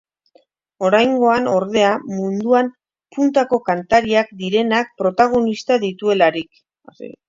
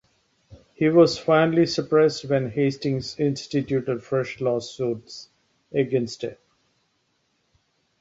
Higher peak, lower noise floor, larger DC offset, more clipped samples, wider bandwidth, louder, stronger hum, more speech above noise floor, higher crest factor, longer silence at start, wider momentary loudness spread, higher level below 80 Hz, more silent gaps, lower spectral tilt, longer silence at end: first, 0 dBFS vs -6 dBFS; second, -57 dBFS vs -70 dBFS; neither; neither; about the same, 7.6 kHz vs 8 kHz; first, -17 LUFS vs -23 LUFS; neither; second, 40 dB vs 48 dB; about the same, 18 dB vs 18 dB; first, 0.8 s vs 0.5 s; second, 8 LU vs 12 LU; about the same, -56 dBFS vs -60 dBFS; neither; about the same, -5.5 dB/octave vs -6.5 dB/octave; second, 0.2 s vs 1.65 s